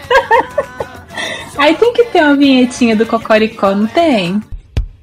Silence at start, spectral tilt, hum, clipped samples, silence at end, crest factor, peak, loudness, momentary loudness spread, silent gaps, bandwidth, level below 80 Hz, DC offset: 0 s; -5 dB/octave; none; under 0.1%; 0.1 s; 12 dB; 0 dBFS; -12 LUFS; 14 LU; none; 15.5 kHz; -32 dBFS; under 0.1%